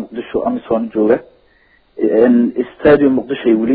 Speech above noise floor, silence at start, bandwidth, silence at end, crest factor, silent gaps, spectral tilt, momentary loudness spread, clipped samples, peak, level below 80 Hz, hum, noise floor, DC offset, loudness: 40 dB; 0 s; 4.5 kHz; 0 s; 14 dB; none; -11 dB/octave; 8 LU; under 0.1%; 0 dBFS; -46 dBFS; none; -53 dBFS; under 0.1%; -14 LUFS